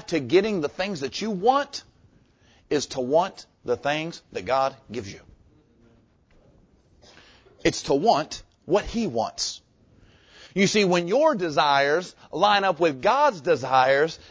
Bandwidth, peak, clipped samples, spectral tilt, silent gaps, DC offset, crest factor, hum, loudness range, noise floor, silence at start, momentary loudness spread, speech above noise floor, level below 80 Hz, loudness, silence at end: 8 kHz; -6 dBFS; under 0.1%; -4 dB/octave; none; under 0.1%; 20 dB; none; 10 LU; -59 dBFS; 0.1 s; 14 LU; 36 dB; -54 dBFS; -23 LUFS; 0.15 s